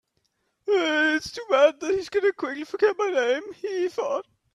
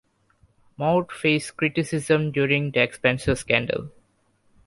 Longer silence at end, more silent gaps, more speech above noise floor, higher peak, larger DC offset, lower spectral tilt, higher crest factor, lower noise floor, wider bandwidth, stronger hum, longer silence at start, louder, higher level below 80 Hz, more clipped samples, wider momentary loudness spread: second, 0.3 s vs 0.75 s; neither; first, 49 dB vs 42 dB; about the same, -6 dBFS vs -4 dBFS; neither; second, -3 dB/octave vs -5.5 dB/octave; about the same, 18 dB vs 22 dB; first, -73 dBFS vs -65 dBFS; about the same, 12 kHz vs 11.5 kHz; neither; second, 0.65 s vs 0.8 s; about the same, -24 LUFS vs -23 LUFS; second, -66 dBFS vs -48 dBFS; neither; first, 11 LU vs 6 LU